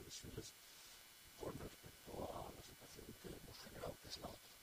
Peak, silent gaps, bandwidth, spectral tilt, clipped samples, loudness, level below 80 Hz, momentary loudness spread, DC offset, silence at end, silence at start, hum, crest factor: -36 dBFS; none; 15.5 kHz; -4 dB/octave; under 0.1%; -54 LUFS; -66 dBFS; 8 LU; under 0.1%; 0 s; 0 s; none; 18 dB